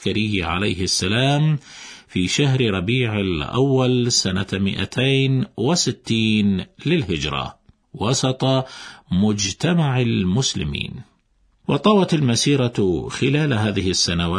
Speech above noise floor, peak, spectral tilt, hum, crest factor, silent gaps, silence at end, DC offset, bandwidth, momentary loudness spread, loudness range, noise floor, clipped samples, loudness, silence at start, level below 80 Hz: 42 dB; -4 dBFS; -5 dB/octave; none; 16 dB; none; 0 s; under 0.1%; 11 kHz; 8 LU; 2 LU; -61 dBFS; under 0.1%; -20 LUFS; 0 s; -44 dBFS